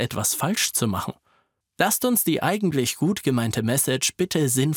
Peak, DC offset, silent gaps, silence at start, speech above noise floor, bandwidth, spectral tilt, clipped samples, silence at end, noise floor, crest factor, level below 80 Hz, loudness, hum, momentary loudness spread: -6 dBFS; under 0.1%; none; 0 s; 44 dB; 19.5 kHz; -4 dB/octave; under 0.1%; 0 s; -67 dBFS; 18 dB; -60 dBFS; -22 LUFS; none; 3 LU